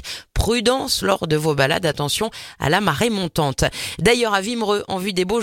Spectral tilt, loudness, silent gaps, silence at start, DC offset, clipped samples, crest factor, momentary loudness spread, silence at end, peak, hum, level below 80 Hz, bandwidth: -4 dB/octave; -20 LUFS; none; 0 s; under 0.1%; under 0.1%; 18 dB; 5 LU; 0 s; -2 dBFS; none; -36 dBFS; 17 kHz